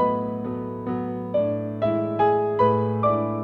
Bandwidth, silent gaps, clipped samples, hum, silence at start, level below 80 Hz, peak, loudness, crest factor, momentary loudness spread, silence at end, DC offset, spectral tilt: 5.4 kHz; none; under 0.1%; none; 0 s; -58 dBFS; -8 dBFS; -24 LUFS; 16 dB; 9 LU; 0 s; under 0.1%; -10.5 dB/octave